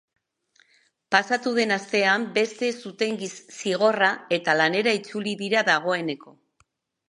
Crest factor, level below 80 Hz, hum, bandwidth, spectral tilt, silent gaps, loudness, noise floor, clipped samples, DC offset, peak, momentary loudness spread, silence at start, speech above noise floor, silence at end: 22 dB; -78 dBFS; none; 11.5 kHz; -3.5 dB/octave; none; -23 LUFS; -68 dBFS; under 0.1%; under 0.1%; -2 dBFS; 9 LU; 1.1 s; 44 dB; 0.8 s